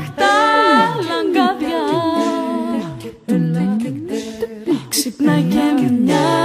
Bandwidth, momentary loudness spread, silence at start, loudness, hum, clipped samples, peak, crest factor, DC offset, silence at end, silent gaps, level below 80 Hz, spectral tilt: 15.5 kHz; 12 LU; 0 s; -17 LUFS; none; under 0.1%; -2 dBFS; 16 dB; under 0.1%; 0 s; none; -54 dBFS; -5 dB/octave